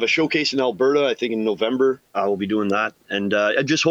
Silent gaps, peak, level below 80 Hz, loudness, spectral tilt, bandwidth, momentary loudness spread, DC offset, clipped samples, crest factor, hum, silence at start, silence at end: none; -6 dBFS; -66 dBFS; -20 LUFS; -4.5 dB/octave; 8 kHz; 5 LU; under 0.1%; under 0.1%; 14 dB; none; 0 s; 0 s